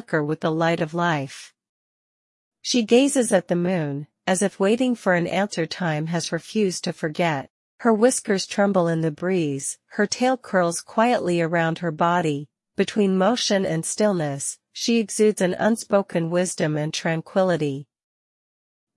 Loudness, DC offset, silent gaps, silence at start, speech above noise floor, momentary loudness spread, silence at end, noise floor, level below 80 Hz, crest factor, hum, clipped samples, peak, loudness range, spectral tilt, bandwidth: -22 LUFS; under 0.1%; 1.69-2.52 s, 7.50-7.78 s; 0.1 s; over 68 dB; 8 LU; 1.15 s; under -90 dBFS; -68 dBFS; 18 dB; none; under 0.1%; -4 dBFS; 2 LU; -4.5 dB/octave; 12 kHz